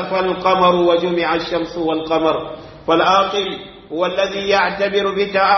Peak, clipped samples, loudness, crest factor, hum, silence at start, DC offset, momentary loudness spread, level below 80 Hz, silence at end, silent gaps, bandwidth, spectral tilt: -2 dBFS; under 0.1%; -17 LUFS; 16 dB; none; 0 s; under 0.1%; 10 LU; -48 dBFS; 0 s; none; 6.4 kHz; -5 dB/octave